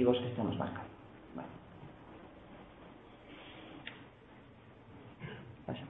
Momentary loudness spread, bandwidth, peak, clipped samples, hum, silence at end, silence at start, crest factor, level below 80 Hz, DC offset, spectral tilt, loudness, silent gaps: 20 LU; 4 kHz; -14 dBFS; under 0.1%; none; 0 s; 0 s; 26 dB; -66 dBFS; under 0.1%; -5.5 dB/octave; -42 LUFS; none